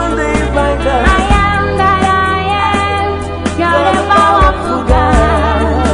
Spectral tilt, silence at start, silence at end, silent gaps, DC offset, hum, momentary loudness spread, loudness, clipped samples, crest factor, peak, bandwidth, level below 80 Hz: -5.5 dB/octave; 0 s; 0 s; none; 0.7%; none; 5 LU; -11 LUFS; under 0.1%; 10 dB; 0 dBFS; 11 kHz; -18 dBFS